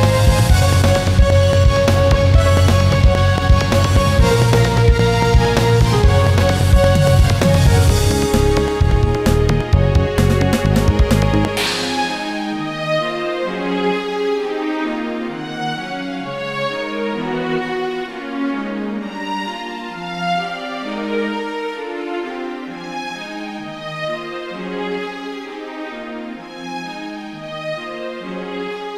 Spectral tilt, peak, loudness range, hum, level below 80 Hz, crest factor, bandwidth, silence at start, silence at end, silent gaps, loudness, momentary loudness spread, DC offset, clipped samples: -6 dB/octave; 0 dBFS; 13 LU; none; -22 dBFS; 16 dB; 16 kHz; 0 s; 0 s; none; -17 LUFS; 14 LU; 0.1%; under 0.1%